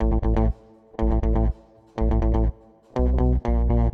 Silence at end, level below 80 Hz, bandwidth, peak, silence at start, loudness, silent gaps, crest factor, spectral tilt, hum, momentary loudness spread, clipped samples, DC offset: 0.05 s; -24 dBFS; 3.5 kHz; -10 dBFS; 0 s; -24 LUFS; none; 12 dB; -10.5 dB/octave; none; 13 LU; under 0.1%; under 0.1%